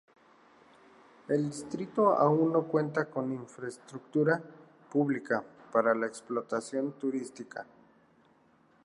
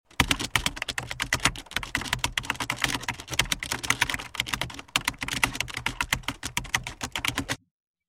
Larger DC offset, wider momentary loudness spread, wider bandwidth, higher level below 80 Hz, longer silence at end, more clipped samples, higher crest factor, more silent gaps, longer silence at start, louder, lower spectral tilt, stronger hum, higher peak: neither; first, 16 LU vs 7 LU; second, 11.5 kHz vs 16.5 kHz; second, -80 dBFS vs -44 dBFS; first, 1.2 s vs 0.55 s; neither; second, 20 dB vs 26 dB; neither; first, 1.3 s vs 0.2 s; second, -31 LUFS vs -28 LUFS; first, -7 dB/octave vs -2 dB/octave; neither; second, -12 dBFS vs -4 dBFS